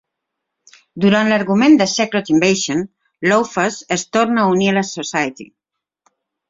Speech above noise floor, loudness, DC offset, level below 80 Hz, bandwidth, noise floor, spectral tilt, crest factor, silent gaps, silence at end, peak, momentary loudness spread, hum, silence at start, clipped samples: 63 dB; -16 LUFS; under 0.1%; -58 dBFS; 7.8 kHz; -78 dBFS; -4.5 dB/octave; 16 dB; none; 1.05 s; 0 dBFS; 9 LU; none; 0.95 s; under 0.1%